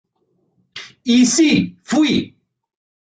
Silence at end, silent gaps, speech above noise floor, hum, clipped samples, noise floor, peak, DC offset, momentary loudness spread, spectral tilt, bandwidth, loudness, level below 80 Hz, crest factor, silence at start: 0.85 s; none; 51 dB; none; under 0.1%; -66 dBFS; -4 dBFS; under 0.1%; 22 LU; -3.5 dB/octave; 9.4 kHz; -16 LUFS; -54 dBFS; 16 dB; 0.75 s